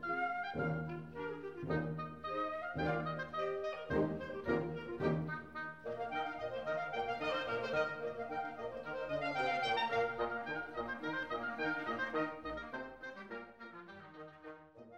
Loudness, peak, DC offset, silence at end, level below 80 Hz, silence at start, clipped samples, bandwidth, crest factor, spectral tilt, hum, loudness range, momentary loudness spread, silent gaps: -39 LUFS; -22 dBFS; under 0.1%; 0 s; -64 dBFS; 0 s; under 0.1%; 9 kHz; 18 dB; -6.5 dB/octave; none; 3 LU; 12 LU; none